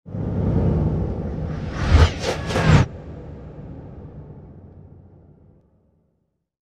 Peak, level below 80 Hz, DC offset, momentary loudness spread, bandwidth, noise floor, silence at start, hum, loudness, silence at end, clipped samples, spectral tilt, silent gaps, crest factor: -2 dBFS; -28 dBFS; under 0.1%; 23 LU; 10 kHz; -71 dBFS; 0.05 s; none; -21 LUFS; 1.9 s; under 0.1%; -6.5 dB/octave; none; 22 dB